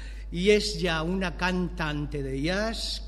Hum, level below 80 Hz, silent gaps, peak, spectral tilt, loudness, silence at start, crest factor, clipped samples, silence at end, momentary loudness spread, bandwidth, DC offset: none; -38 dBFS; none; -8 dBFS; -5 dB/octave; -27 LUFS; 0 s; 20 dB; under 0.1%; 0 s; 8 LU; 12.5 kHz; under 0.1%